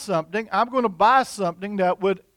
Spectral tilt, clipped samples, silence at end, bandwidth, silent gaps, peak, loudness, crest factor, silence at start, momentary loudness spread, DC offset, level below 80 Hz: -5 dB/octave; under 0.1%; 0.2 s; 16.5 kHz; none; -6 dBFS; -22 LUFS; 16 dB; 0 s; 9 LU; under 0.1%; -60 dBFS